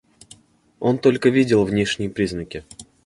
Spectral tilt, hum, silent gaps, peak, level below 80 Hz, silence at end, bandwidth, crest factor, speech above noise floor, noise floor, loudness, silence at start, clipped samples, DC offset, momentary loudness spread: -6 dB/octave; none; none; -2 dBFS; -48 dBFS; 0.25 s; 11.5 kHz; 18 dB; 32 dB; -51 dBFS; -20 LUFS; 0.8 s; under 0.1%; under 0.1%; 15 LU